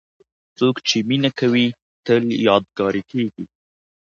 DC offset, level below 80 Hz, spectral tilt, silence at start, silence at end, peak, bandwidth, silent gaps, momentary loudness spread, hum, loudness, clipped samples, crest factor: under 0.1%; -60 dBFS; -5 dB/octave; 0.6 s; 0.7 s; 0 dBFS; 7.4 kHz; 1.82-2.03 s; 9 LU; none; -19 LUFS; under 0.1%; 20 dB